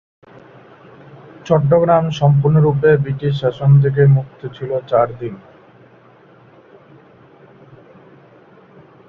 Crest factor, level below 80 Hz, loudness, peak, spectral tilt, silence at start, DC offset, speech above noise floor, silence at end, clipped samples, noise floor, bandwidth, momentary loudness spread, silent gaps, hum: 16 dB; -50 dBFS; -15 LUFS; -2 dBFS; -9 dB/octave; 1.45 s; under 0.1%; 33 dB; 3.7 s; under 0.1%; -47 dBFS; 6.6 kHz; 17 LU; none; none